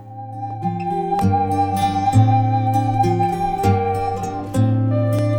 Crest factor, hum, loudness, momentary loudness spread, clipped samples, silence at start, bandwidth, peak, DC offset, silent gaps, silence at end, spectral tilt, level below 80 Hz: 16 dB; none; -19 LUFS; 9 LU; under 0.1%; 0 s; 14.5 kHz; -2 dBFS; under 0.1%; none; 0 s; -8 dB/octave; -42 dBFS